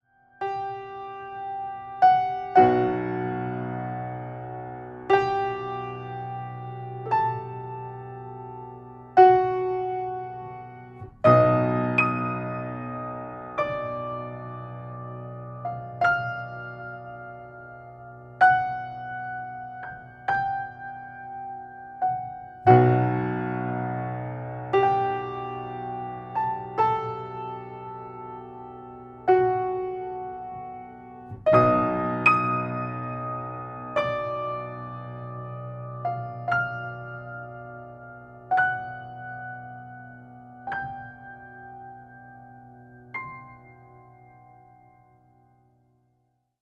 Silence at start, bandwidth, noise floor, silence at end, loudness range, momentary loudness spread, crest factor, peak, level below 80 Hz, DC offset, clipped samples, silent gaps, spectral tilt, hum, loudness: 0.4 s; 7.8 kHz; -72 dBFS; 2.35 s; 14 LU; 22 LU; 24 dB; -4 dBFS; -58 dBFS; under 0.1%; under 0.1%; none; -8.5 dB/octave; none; -26 LUFS